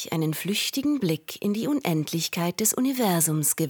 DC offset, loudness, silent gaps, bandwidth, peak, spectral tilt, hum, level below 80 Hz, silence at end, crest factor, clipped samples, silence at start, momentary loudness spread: under 0.1%; -25 LUFS; none; 19 kHz; -8 dBFS; -4 dB/octave; none; -70 dBFS; 0 s; 18 dB; under 0.1%; 0 s; 6 LU